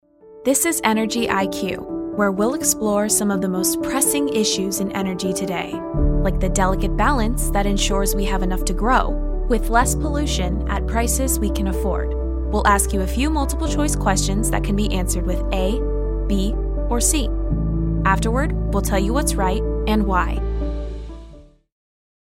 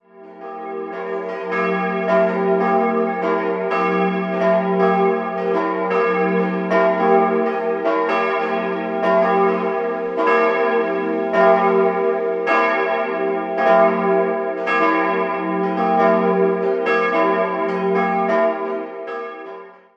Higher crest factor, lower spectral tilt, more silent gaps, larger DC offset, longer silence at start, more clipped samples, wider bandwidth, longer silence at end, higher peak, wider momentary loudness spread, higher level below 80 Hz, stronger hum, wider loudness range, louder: about the same, 18 dB vs 18 dB; second, -4.5 dB/octave vs -7.5 dB/octave; neither; neither; about the same, 0.25 s vs 0.15 s; neither; first, 16.5 kHz vs 7 kHz; first, 0.95 s vs 0.25 s; about the same, -2 dBFS vs -2 dBFS; second, 7 LU vs 10 LU; first, -24 dBFS vs -70 dBFS; neither; about the same, 2 LU vs 2 LU; about the same, -20 LUFS vs -18 LUFS